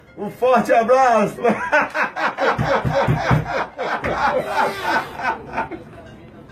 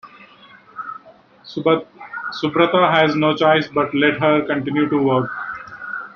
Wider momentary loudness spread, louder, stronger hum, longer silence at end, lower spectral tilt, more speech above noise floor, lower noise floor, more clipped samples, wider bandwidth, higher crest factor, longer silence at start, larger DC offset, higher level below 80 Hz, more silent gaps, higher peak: second, 10 LU vs 17 LU; about the same, -19 LUFS vs -17 LUFS; neither; about the same, 0.05 s vs 0.05 s; about the same, -6 dB/octave vs -7 dB/octave; second, 21 dB vs 31 dB; second, -40 dBFS vs -47 dBFS; neither; first, 15 kHz vs 6.8 kHz; about the same, 16 dB vs 18 dB; about the same, 0.15 s vs 0.05 s; neither; first, -42 dBFS vs -60 dBFS; neither; about the same, -2 dBFS vs -2 dBFS